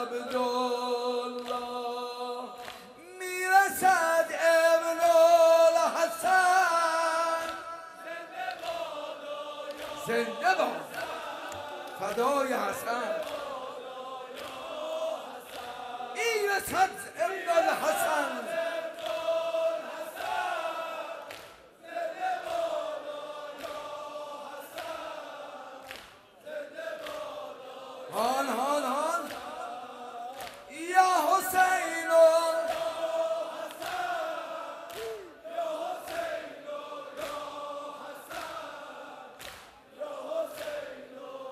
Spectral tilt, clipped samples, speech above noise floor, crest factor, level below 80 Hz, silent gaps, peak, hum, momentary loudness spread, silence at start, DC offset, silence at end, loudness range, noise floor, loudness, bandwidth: -2 dB/octave; under 0.1%; 23 dB; 20 dB; -72 dBFS; none; -10 dBFS; none; 18 LU; 0 s; under 0.1%; 0 s; 16 LU; -52 dBFS; -29 LUFS; 15.5 kHz